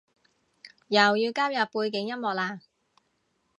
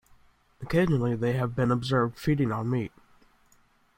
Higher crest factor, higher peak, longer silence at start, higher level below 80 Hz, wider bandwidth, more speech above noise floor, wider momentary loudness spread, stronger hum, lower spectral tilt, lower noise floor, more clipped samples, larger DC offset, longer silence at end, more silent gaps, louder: first, 24 dB vs 18 dB; first, -4 dBFS vs -10 dBFS; about the same, 0.65 s vs 0.6 s; second, -82 dBFS vs -52 dBFS; second, 10.5 kHz vs 16.5 kHz; first, 47 dB vs 37 dB; first, 10 LU vs 6 LU; neither; second, -4 dB/octave vs -7.5 dB/octave; first, -73 dBFS vs -63 dBFS; neither; neither; about the same, 1 s vs 1.1 s; neither; about the same, -26 LUFS vs -27 LUFS